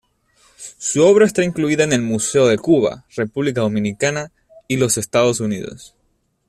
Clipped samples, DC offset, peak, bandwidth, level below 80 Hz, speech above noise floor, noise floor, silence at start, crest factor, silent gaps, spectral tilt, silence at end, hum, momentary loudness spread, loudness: under 0.1%; under 0.1%; -2 dBFS; 14 kHz; -54 dBFS; 48 dB; -65 dBFS; 0.6 s; 16 dB; none; -4.5 dB/octave; 0.65 s; none; 14 LU; -17 LUFS